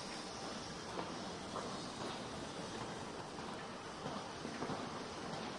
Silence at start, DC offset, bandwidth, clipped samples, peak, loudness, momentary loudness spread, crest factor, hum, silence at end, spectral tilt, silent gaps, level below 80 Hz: 0 s; under 0.1%; 11.5 kHz; under 0.1%; -28 dBFS; -45 LUFS; 3 LU; 18 dB; none; 0 s; -4 dB/octave; none; -68 dBFS